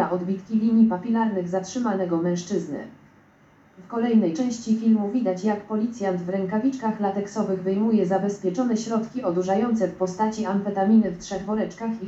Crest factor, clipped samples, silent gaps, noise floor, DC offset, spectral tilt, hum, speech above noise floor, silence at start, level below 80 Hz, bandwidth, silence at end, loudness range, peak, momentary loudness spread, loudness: 16 dB; under 0.1%; none; -55 dBFS; under 0.1%; -7 dB/octave; none; 32 dB; 0 s; -62 dBFS; 8 kHz; 0 s; 2 LU; -8 dBFS; 7 LU; -24 LUFS